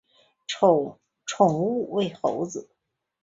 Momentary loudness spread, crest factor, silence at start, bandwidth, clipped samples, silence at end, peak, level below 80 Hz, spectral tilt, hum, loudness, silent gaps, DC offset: 16 LU; 20 dB; 0.5 s; 8 kHz; under 0.1%; 0.6 s; -4 dBFS; -68 dBFS; -5.5 dB/octave; none; -24 LUFS; none; under 0.1%